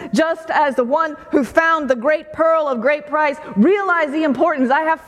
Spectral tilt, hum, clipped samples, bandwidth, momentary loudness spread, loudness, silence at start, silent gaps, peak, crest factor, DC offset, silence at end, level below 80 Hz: -6 dB/octave; none; under 0.1%; 13 kHz; 4 LU; -17 LUFS; 0 s; none; 0 dBFS; 16 dB; under 0.1%; 0.1 s; -56 dBFS